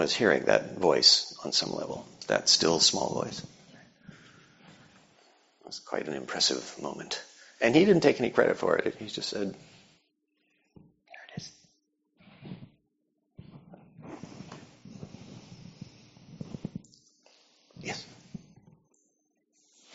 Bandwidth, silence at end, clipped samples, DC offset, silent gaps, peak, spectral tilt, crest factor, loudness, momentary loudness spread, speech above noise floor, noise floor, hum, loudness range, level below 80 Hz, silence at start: 8 kHz; 1.55 s; under 0.1%; under 0.1%; none; -6 dBFS; -2 dB/octave; 26 dB; -26 LUFS; 26 LU; 50 dB; -77 dBFS; none; 25 LU; -68 dBFS; 0 s